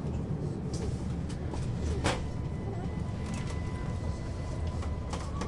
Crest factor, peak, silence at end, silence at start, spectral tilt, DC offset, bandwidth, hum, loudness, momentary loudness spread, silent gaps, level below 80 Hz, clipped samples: 18 dB; -16 dBFS; 0 s; 0 s; -6.5 dB/octave; under 0.1%; 11.5 kHz; none; -35 LUFS; 5 LU; none; -40 dBFS; under 0.1%